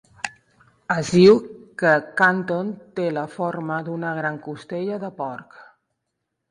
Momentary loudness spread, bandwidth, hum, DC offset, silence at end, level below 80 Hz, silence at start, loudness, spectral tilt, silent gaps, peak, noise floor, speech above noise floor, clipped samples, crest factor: 18 LU; 11 kHz; none; under 0.1%; 0.85 s; -60 dBFS; 0.25 s; -21 LUFS; -6 dB/octave; none; -2 dBFS; -79 dBFS; 58 dB; under 0.1%; 20 dB